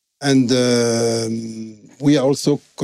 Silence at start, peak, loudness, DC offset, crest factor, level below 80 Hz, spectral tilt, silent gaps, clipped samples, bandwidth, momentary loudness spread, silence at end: 0.2 s; -6 dBFS; -17 LUFS; under 0.1%; 12 dB; -62 dBFS; -5 dB/octave; none; under 0.1%; 14.5 kHz; 14 LU; 0 s